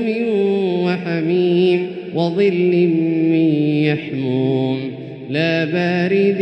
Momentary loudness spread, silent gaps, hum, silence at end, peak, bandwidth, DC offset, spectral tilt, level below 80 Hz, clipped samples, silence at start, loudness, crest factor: 6 LU; none; none; 0 s; -4 dBFS; 6.2 kHz; under 0.1%; -8.5 dB/octave; -64 dBFS; under 0.1%; 0 s; -17 LUFS; 12 dB